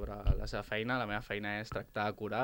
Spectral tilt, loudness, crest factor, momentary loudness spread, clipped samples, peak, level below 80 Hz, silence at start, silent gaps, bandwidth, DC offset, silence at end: -6.5 dB/octave; -37 LUFS; 18 dB; 3 LU; under 0.1%; -18 dBFS; -42 dBFS; 0 s; none; 17 kHz; under 0.1%; 0 s